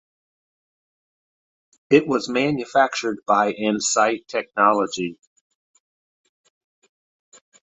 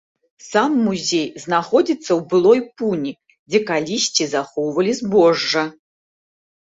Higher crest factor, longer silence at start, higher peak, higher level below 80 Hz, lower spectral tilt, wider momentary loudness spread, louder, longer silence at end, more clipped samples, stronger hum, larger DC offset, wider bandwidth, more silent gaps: about the same, 22 dB vs 18 dB; first, 1.9 s vs 0.45 s; about the same, -2 dBFS vs -2 dBFS; second, -68 dBFS vs -62 dBFS; about the same, -3.5 dB/octave vs -4 dB/octave; about the same, 8 LU vs 8 LU; about the same, -20 LUFS vs -18 LUFS; first, 2.6 s vs 1.05 s; neither; neither; neither; about the same, 8.4 kHz vs 8 kHz; second, none vs 3.39-3.46 s